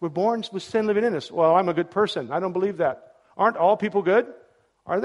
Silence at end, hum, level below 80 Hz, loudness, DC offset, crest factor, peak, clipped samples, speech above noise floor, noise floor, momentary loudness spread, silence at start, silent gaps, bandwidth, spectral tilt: 0 s; none; -68 dBFS; -23 LUFS; under 0.1%; 18 dB; -6 dBFS; under 0.1%; 31 dB; -53 dBFS; 7 LU; 0 s; none; 11.5 kHz; -6.5 dB/octave